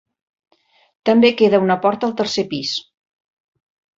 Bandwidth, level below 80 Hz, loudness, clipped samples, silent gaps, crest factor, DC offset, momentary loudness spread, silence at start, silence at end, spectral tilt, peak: 7.8 kHz; -62 dBFS; -17 LUFS; under 0.1%; none; 18 dB; under 0.1%; 11 LU; 1.05 s; 1.2 s; -5 dB/octave; -2 dBFS